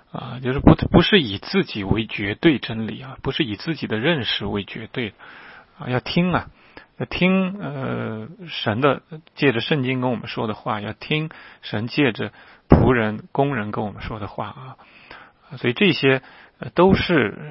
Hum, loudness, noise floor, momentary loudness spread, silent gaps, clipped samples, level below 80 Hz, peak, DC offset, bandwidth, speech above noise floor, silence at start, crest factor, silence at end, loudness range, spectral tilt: none; -21 LUFS; -45 dBFS; 16 LU; none; under 0.1%; -38 dBFS; 0 dBFS; under 0.1%; 5.8 kHz; 24 dB; 0.15 s; 22 dB; 0 s; 4 LU; -10 dB/octave